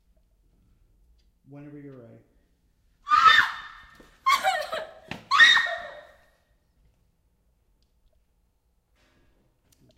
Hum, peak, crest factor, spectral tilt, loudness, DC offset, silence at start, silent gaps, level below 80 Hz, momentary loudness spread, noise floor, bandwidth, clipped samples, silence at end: none; -4 dBFS; 24 dB; -0.5 dB/octave; -20 LUFS; under 0.1%; 1.55 s; none; -62 dBFS; 29 LU; -69 dBFS; 16 kHz; under 0.1%; 3.95 s